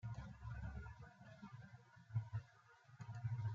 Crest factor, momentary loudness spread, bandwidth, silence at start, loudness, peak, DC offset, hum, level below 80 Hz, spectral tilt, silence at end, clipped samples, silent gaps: 18 dB; 17 LU; 7.4 kHz; 0 s; -52 LUFS; -32 dBFS; under 0.1%; none; -62 dBFS; -7.5 dB/octave; 0 s; under 0.1%; none